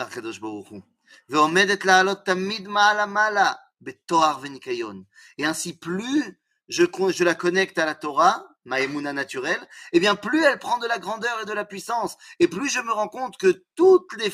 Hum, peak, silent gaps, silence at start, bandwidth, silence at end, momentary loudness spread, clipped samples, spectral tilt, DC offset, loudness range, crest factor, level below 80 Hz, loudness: none; -2 dBFS; none; 0 s; 15 kHz; 0 s; 13 LU; under 0.1%; -3.5 dB/octave; under 0.1%; 5 LU; 20 dB; -70 dBFS; -22 LUFS